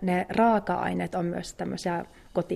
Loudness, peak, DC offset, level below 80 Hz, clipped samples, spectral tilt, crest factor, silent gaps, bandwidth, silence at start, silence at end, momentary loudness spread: -28 LUFS; -12 dBFS; under 0.1%; -56 dBFS; under 0.1%; -6.5 dB/octave; 16 dB; none; 13.5 kHz; 0 s; 0 s; 11 LU